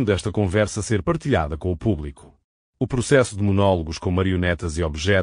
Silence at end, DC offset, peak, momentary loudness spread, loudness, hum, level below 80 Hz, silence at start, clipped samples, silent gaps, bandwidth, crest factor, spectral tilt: 0 s; under 0.1%; -4 dBFS; 7 LU; -22 LUFS; none; -38 dBFS; 0 s; under 0.1%; 2.44-2.73 s; 10.5 kHz; 18 dB; -6 dB/octave